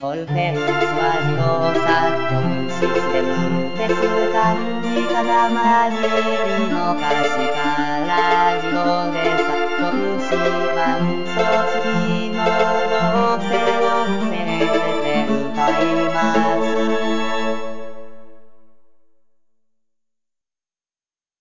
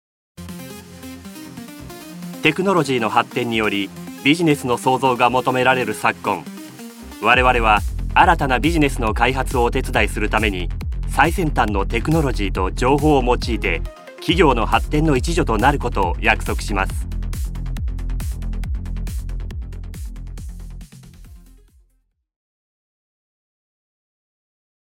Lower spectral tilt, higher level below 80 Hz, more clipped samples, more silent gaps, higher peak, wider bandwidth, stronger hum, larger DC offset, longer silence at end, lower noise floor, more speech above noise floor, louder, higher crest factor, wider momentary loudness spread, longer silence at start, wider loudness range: about the same, -5.5 dB/octave vs -5.5 dB/octave; second, -58 dBFS vs -28 dBFS; neither; neither; second, -6 dBFS vs 0 dBFS; second, 7.6 kHz vs 17 kHz; neither; first, 5% vs under 0.1%; second, 0 s vs 3.55 s; first, under -90 dBFS vs -65 dBFS; first, over 72 dB vs 47 dB; about the same, -19 LUFS vs -19 LUFS; second, 14 dB vs 20 dB; second, 5 LU vs 20 LU; second, 0 s vs 0.4 s; second, 3 LU vs 13 LU